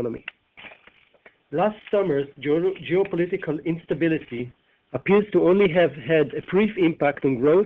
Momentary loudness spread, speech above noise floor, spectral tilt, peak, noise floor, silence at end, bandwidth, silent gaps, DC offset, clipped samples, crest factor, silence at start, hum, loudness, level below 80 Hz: 13 LU; 35 dB; -9.5 dB/octave; -6 dBFS; -56 dBFS; 0 s; 4.1 kHz; none; under 0.1%; under 0.1%; 16 dB; 0 s; none; -22 LUFS; -58 dBFS